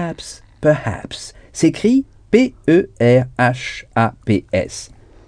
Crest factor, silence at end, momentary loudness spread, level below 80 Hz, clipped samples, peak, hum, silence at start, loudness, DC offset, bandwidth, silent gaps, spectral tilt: 18 dB; 0.4 s; 16 LU; -44 dBFS; under 0.1%; 0 dBFS; none; 0 s; -17 LUFS; under 0.1%; 10 kHz; none; -6 dB/octave